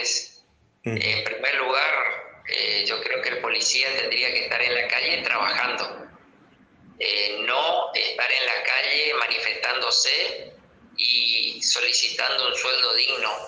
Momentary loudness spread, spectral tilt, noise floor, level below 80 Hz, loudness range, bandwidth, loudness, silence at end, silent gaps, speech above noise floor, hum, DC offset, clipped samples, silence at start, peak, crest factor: 8 LU; -0.5 dB/octave; -58 dBFS; -68 dBFS; 3 LU; 10 kHz; -21 LUFS; 0 s; none; 34 dB; none; under 0.1%; under 0.1%; 0 s; -6 dBFS; 18 dB